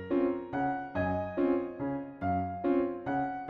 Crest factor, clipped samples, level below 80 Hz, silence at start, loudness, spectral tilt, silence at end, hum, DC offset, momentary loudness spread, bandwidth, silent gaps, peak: 14 dB; under 0.1%; -58 dBFS; 0 s; -32 LUFS; -10 dB/octave; 0 s; none; under 0.1%; 5 LU; 4.8 kHz; none; -18 dBFS